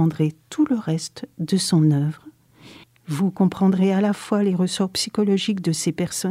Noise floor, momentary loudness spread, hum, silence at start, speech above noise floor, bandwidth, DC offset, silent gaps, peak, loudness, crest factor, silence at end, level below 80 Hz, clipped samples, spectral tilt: -47 dBFS; 9 LU; none; 0 s; 27 dB; 15 kHz; under 0.1%; none; -8 dBFS; -21 LUFS; 14 dB; 0 s; -62 dBFS; under 0.1%; -6 dB/octave